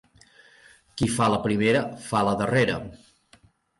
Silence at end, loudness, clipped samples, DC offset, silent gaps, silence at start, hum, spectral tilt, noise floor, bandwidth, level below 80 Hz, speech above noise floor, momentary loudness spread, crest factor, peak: 0.85 s; -24 LUFS; under 0.1%; under 0.1%; none; 0.95 s; none; -5.5 dB/octave; -59 dBFS; 11.5 kHz; -52 dBFS; 35 dB; 10 LU; 16 dB; -10 dBFS